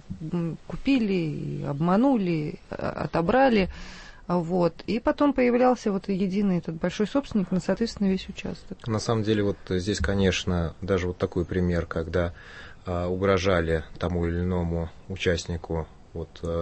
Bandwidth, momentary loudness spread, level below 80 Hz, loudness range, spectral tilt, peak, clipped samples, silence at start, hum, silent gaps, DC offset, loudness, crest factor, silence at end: 8.6 kHz; 11 LU; -42 dBFS; 3 LU; -6.5 dB/octave; -8 dBFS; under 0.1%; 0.05 s; none; none; under 0.1%; -26 LUFS; 16 dB; 0 s